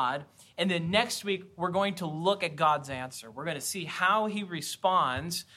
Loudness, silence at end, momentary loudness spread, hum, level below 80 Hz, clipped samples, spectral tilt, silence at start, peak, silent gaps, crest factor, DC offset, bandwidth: -29 LUFS; 0.15 s; 11 LU; none; -64 dBFS; under 0.1%; -4 dB/octave; 0 s; -10 dBFS; none; 20 dB; under 0.1%; 16 kHz